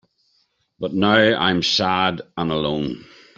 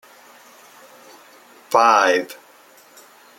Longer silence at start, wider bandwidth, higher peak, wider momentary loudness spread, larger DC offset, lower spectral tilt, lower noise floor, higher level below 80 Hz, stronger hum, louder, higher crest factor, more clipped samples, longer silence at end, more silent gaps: second, 0.8 s vs 1.7 s; second, 7.8 kHz vs 16.5 kHz; about the same, -2 dBFS vs -2 dBFS; second, 13 LU vs 22 LU; neither; first, -5 dB/octave vs -2 dB/octave; first, -66 dBFS vs -49 dBFS; first, -54 dBFS vs -78 dBFS; neither; second, -19 LUFS vs -16 LUFS; about the same, 18 dB vs 22 dB; neither; second, 0.35 s vs 1.05 s; neither